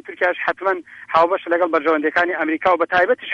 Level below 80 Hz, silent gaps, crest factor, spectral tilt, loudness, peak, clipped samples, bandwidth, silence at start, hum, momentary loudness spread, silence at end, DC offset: -60 dBFS; none; 14 dB; -5.5 dB/octave; -18 LUFS; -4 dBFS; under 0.1%; 7.4 kHz; 0.05 s; none; 5 LU; 0 s; under 0.1%